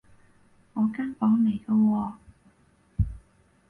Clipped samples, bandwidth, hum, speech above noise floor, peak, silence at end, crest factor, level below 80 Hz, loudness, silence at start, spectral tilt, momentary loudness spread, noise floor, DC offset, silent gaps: under 0.1%; 3.4 kHz; none; 38 dB; -14 dBFS; 0.5 s; 14 dB; -42 dBFS; -26 LUFS; 0.75 s; -10 dB/octave; 13 LU; -62 dBFS; under 0.1%; none